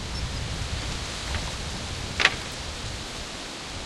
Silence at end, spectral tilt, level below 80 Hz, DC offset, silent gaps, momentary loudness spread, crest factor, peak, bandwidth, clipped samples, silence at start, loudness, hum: 0 s; -3 dB/octave; -38 dBFS; under 0.1%; none; 11 LU; 30 dB; -2 dBFS; 13.5 kHz; under 0.1%; 0 s; -29 LUFS; none